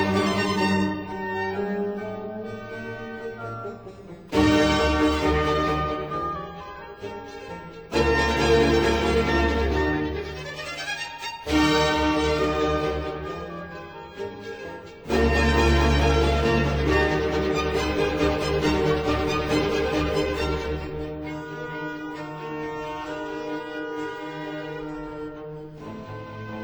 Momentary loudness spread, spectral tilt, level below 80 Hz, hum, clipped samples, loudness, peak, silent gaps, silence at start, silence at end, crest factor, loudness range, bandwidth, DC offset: 17 LU; -5.5 dB/octave; -34 dBFS; none; under 0.1%; -24 LUFS; -6 dBFS; none; 0 s; 0 s; 18 dB; 10 LU; over 20 kHz; under 0.1%